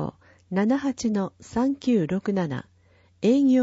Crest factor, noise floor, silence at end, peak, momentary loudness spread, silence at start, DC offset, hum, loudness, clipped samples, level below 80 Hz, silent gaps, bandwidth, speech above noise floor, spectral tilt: 14 dB; -59 dBFS; 0 s; -10 dBFS; 9 LU; 0 s; under 0.1%; none; -25 LUFS; under 0.1%; -58 dBFS; none; 8 kHz; 36 dB; -7 dB/octave